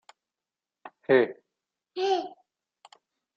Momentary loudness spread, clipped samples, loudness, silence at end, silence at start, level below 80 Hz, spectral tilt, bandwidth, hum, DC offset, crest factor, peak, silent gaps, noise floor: 19 LU; under 0.1%; -26 LUFS; 1.05 s; 0.85 s; -80 dBFS; -5.5 dB/octave; 7.6 kHz; none; under 0.1%; 22 dB; -8 dBFS; none; under -90 dBFS